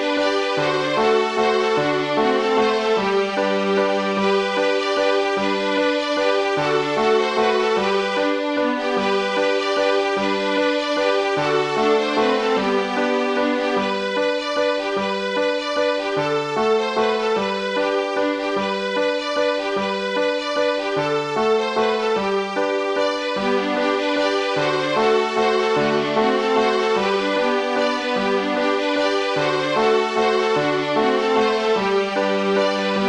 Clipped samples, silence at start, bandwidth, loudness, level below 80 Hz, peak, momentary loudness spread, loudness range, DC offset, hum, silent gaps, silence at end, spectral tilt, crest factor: under 0.1%; 0 s; 10.5 kHz; -20 LUFS; -58 dBFS; -6 dBFS; 3 LU; 2 LU; under 0.1%; none; none; 0 s; -4.5 dB/octave; 14 dB